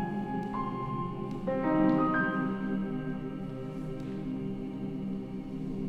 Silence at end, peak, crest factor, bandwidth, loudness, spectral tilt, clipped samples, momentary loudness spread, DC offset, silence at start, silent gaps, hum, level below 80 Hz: 0 s; -14 dBFS; 18 dB; 8 kHz; -33 LUFS; -9 dB/octave; under 0.1%; 11 LU; under 0.1%; 0 s; none; none; -50 dBFS